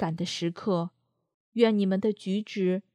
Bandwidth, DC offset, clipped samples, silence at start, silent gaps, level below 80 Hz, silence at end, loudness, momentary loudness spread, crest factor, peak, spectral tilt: 10.5 kHz; under 0.1%; under 0.1%; 0 s; 1.34-1.52 s; -74 dBFS; 0.15 s; -28 LUFS; 8 LU; 20 dB; -8 dBFS; -6.5 dB/octave